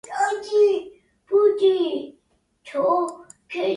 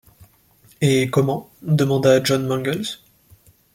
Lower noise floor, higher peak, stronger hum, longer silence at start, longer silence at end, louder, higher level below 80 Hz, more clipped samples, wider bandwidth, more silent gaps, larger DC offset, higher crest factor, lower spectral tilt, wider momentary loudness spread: first, -66 dBFS vs -54 dBFS; second, -8 dBFS vs -4 dBFS; neither; second, 0.1 s vs 0.8 s; second, 0 s vs 0.8 s; second, -22 LUFS vs -19 LUFS; second, -70 dBFS vs -56 dBFS; neither; second, 11 kHz vs 16.5 kHz; neither; neither; about the same, 14 dB vs 18 dB; second, -4 dB/octave vs -6 dB/octave; about the same, 13 LU vs 12 LU